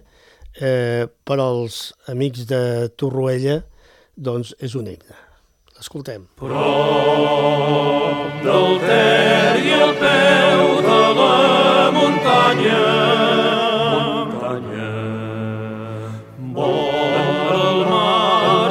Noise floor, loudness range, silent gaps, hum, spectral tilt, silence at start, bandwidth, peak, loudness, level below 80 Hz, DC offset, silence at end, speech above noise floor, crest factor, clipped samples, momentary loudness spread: -54 dBFS; 10 LU; none; none; -5.5 dB/octave; 0.45 s; 15.5 kHz; 0 dBFS; -16 LUFS; -54 dBFS; under 0.1%; 0 s; 38 dB; 16 dB; under 0.1%; 16 LU